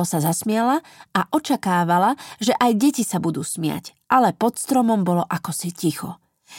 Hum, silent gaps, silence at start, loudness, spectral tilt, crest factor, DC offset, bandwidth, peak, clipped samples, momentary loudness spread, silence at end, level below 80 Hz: none; none; 0 s; -21 LUFS; -5 dB/octave; 18 dB; under 0.1%; 17 kHz; -2 dBFS; under 0.1%; 8 LU; 0 s; -64 dBFS